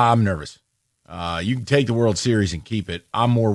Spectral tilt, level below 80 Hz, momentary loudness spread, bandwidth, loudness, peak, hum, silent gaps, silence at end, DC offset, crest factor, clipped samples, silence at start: -6 dB/octave; -46 dBFS; 12 LU; 11.5 kHz; -21 LUFS; -4 dBFS; none; none; 0 s; under 0.1%; 16 dB; under 0.1%; 0 s